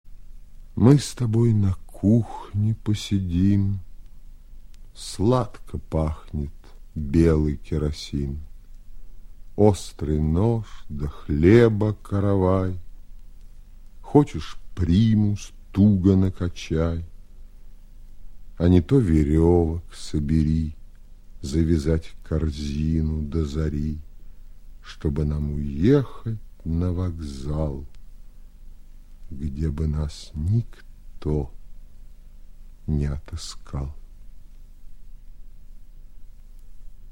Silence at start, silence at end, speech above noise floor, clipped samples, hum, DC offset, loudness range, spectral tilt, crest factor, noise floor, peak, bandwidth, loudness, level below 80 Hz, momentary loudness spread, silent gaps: 0.05 s; 0 s; 21 dB; under 0.1%; none; under 0.1%; 10 LU; -8 dB/octave; 22 dB; -42 dBFS; -2 dBFS; 12.5 kHz; -23 LUFS; -34 dBFS; 15 LU; none